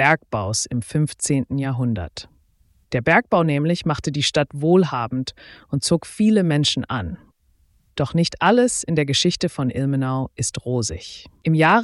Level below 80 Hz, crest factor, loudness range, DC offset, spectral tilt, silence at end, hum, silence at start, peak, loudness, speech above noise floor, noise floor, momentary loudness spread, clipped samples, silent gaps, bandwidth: -48 dBFS; 18 dB; 2 LU; under 0.1%; -5 dB/octave; 0 s; none; 0 s; -4 dBFS; -20 LUFS; 40 dB; -60 dBFS; 11 LU; under 0.1%; none; 12 kHz